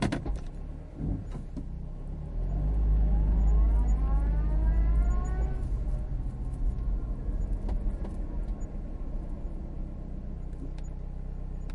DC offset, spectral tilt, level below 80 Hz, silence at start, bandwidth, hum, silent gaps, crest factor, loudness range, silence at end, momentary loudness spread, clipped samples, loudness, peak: under 0.1%; -8 dB/octave; -30 dBFS; 0 s; 7.2 kHz; none; none; 14 dB; 10 LU; 0 s; 13 LU; under 0.1%; -33 LUFS; -14 dBFS